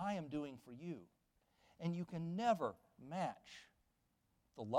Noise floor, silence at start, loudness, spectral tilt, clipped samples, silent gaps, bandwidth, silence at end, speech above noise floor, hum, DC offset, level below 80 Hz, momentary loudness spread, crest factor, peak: -82 dBFS; 0 s; -44 LUFS; -7 dB/octave; under 0.1%; none; 13.5 kHz; 0 s; 38 dB; none; under 0.1%; -78 dBFS; 20 LU; 20 dB; -24 dBFS